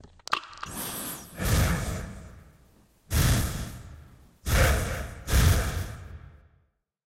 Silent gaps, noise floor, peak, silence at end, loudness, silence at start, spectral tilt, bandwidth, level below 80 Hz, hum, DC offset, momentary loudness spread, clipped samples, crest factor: none; -69 dBFS; -6 dBFS; 0.8 s; -28 LUFS; 0.05 s; -4.5 dB/octave; 16 kHz; -32 dBFS; none; under 0.1%; 20 LU; under 0.1%; 22 dB